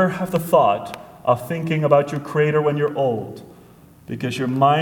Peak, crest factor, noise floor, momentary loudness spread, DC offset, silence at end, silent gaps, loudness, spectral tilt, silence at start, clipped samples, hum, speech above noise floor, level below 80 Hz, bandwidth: 0 dBFS; 20 dB; -47 dBFS; 12 LU; under 0.1%; 0 s; none; -20 LUFS; -7 dB/octave; 0 s; under 0.1%; none; 28 dB; -58 dBFS; 19 kHz